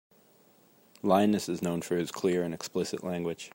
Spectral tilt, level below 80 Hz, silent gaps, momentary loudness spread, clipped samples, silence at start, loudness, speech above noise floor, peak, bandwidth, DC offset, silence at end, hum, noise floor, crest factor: -5.5 dB/octave; -72 dBFS; none; 9 LU; under 0.1%; 1.05 s; -30 LUFS; 33 dB; -10 dBFS; 16.5 kHz; under 0.1%; 0.05 s; none; -62 dBFS; 20 dB